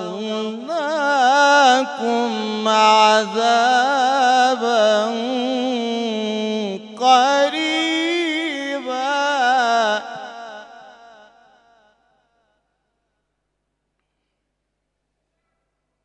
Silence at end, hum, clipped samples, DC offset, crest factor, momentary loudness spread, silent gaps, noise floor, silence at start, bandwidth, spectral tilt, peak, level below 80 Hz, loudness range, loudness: 5.15 s; 50 Hz at -75 dBFS; under 0.1%; under 0.1%; 18 dB; 12 LU; none; -75 dBFS; 0 s; 10.5 kHz; -2.5 dB/octave; -2 dBFS; -76 dBFS; 7 LU; -17 LUFS